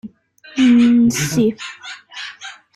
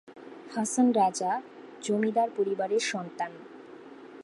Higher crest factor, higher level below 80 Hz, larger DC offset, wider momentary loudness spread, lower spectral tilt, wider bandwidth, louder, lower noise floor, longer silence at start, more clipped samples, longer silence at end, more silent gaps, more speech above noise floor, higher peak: about the same, 12 dB vs 16 dB; first, -54 dBFS vs -82 dBFS; neither; second, 20 LU vs 23 LU; about the same, -4.5 dB/octave vs -4 dB/octave; first, 13.5 kHz vs 11.5 kHz; first, -14 LUFS vs -28 LUFS; about the same, -44 dBFS vs -47 dBFS; about the same, 0.05 s vs 0.1 s; neither; first, 0.2 s vs 0 s; neither; first, 30 dB vs 20 dB; first, -4 dBFS vs -12 dBFS